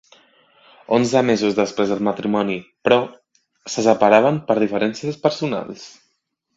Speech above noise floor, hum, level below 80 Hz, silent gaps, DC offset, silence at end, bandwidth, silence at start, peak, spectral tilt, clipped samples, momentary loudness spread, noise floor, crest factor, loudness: 53 dB; none; -60 dBFS; none; under 0.1%; 0.7 s; 8 kHz; 0.9 s; 0 dBFS; -5.5 dB/octave; under 0.1%; 13 LU; -71 dBFS; 20 dB; -19 LUFS